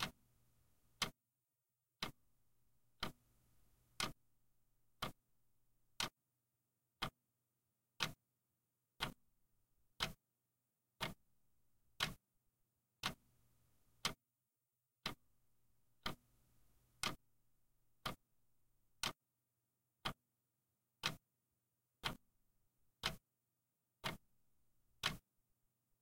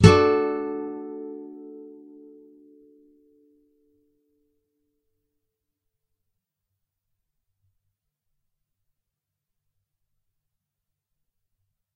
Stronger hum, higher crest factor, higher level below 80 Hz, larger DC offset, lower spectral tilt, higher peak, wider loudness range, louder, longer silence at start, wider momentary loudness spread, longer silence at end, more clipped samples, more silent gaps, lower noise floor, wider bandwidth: neither; about the same, 30 dB vs 28 dB; second, -70 dBFS vs -50 dBFS; neither; second, -2 dB/octave vs -6.5 dB/octave; second, -22 dBFS vs 0 dBFS; second, 2 LU vs 27 LU; second, -47 LUFS vs -23 LUFS; about the same, 0 s vs 0 s; second, 17 LU vs 27 LU; second, 0.85 s vs 10.1 s; neither; neither; first, under -90 dBFS vs -85 dBFS; first, 16 kHz vs 10.5 kHz